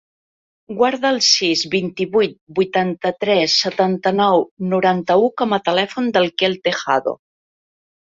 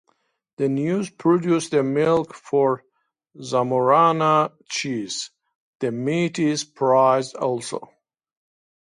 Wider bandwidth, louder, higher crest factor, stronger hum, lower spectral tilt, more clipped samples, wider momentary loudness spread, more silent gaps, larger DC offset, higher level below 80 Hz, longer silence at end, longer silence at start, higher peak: second, 7.8 kHz vs 11.5 kHz; first, -17 LUFS vs -21 LUFS; about the same, 16 dB vs 18 dB; neither; second, -3.5 dB/octave vs -5.5 dB/octave; neither; second, 7 LU vs 12 LU; second, 2.41-2.47 s, 4.51-4.57 s vs 5.55-5.80 s; neither; first, -62 dBFS vs -68 dBFS; about the same, 0.85 s vs 0.95 s; about the same, 0.7 s vs 0.6 s; about the same, -2 dBFS vs -4 dBFS